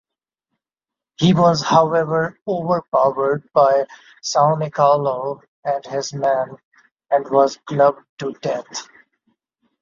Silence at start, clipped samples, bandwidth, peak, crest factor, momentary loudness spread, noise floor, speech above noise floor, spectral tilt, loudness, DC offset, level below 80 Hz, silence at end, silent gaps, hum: 1.2 s; under 0.1%; 7.6 kHz; -2 dBFS; 18 dB; 13 LU; -88 dBFS; 70 dB; -5.5 dB/octave; -18 LUFS; under 0.1%; -60 dBFS; 1 s; 2.42-2.46 s, 2.88-2.92 s, 5.48-5.63 s, 6.64-6.72 s, 6.92-6.96 s, 8.09-8.17 s; none